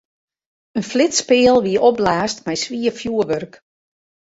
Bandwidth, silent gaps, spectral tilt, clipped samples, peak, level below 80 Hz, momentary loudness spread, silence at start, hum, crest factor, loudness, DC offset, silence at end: 8 kHz; none; -3.5 dB/octave; under 0.1%; -2 dBFS; -52 dBFS; 12 LU; 0.75 s; none; 16 dB; -17 LUFS; under 0.1%; 0.75 s